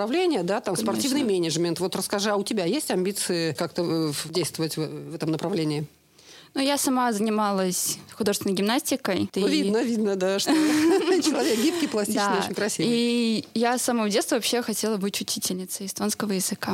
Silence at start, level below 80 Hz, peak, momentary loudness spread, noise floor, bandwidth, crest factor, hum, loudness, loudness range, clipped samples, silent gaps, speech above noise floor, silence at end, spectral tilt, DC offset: 0 s; -72 dBFS; -8 dBFS; 6 LU; -51 dBFS; 16.5 kHz; 16 dB; none; -25 LUFS; 4 LU; under 0.1%; none; 26 dB; 0 s; -4 dB/octave; under 0.1%